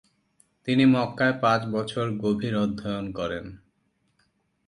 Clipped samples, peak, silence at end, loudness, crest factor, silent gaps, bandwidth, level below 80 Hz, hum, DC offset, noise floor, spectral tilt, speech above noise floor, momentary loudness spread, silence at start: under 0.1%; -8 dBFS; 1.1 s; -25 LUFS; 18 dB; none; 11 kHz; -56 dBFS; none; under 0.1%; -71 dBFS; -7 dB/octave; 46 dB; 11 LU; 0.65 s